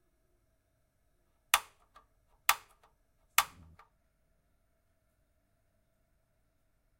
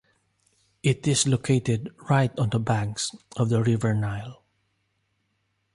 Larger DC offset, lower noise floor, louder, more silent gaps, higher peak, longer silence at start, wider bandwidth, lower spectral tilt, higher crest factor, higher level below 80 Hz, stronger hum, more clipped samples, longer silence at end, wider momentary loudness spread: neither; about the same, -75 dBFS vs -73 dBFS; second, -32 LUFS vs -25 LUFS; neither; first, -6 dBFS vs -10 dBFS; first, 1.55 s vs 0.85 s; first, 16 kHz vs 11.5 kHz; second, 2 dB/octave vs -5 dB/octave; first, 36 dB vs 16 dB; second, -70 dBFS vs -54 dBFS; neither; neither; first, 3.55 s vs 1.4 s; about the same, 6 LU vs 8 LU